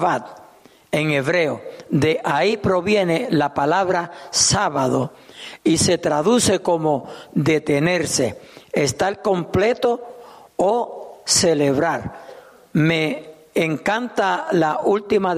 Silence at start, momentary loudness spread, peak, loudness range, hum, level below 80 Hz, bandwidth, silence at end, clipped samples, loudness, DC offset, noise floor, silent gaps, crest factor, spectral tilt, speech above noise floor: 0 s; 11 LU; -4 dBFS; 2 LU; none; -52 dBFS; 15 kHz; 0 s; under 0.1%; -19 LUFS; under 0.1%; -49 dBFS; none; 16 dB; -4 dB/octave; 30 dB